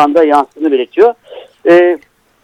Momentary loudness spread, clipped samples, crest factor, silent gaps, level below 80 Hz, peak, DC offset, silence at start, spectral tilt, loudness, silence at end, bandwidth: 10 LU; 0.3%; 10 dB; none; -58 dBFS; 0 dBFS; under 0.1%; 0 s; -6 dB/octave; -11 LUFS; 0.45 s; 9.8 kHz